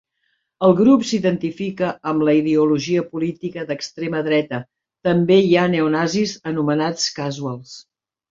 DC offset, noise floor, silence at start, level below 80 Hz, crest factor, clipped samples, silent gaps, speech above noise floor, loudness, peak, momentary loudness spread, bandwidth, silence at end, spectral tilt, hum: under 0.1%; -70 dBFS; 0.6 s; -60 dBFS; 18 dB; under 0.1%; none; 52 dB; -19 LUFS; -2 dBFS; 12 LU; 7.8 kHz; 0.5 s; -5.5 dB/octave; none